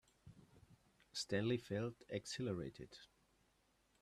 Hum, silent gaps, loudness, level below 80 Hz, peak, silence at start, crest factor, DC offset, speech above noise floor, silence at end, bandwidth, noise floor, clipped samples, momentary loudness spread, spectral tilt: none; none; -44 LUFS; -74 dBFS; -26 dBFS; 0.25 s; 20 dB; under 0.1%; 35 dB; 0.95 s; 13.5 kHz; -78 dBFS; under 0.1%; 23 LU; -5 dB/octave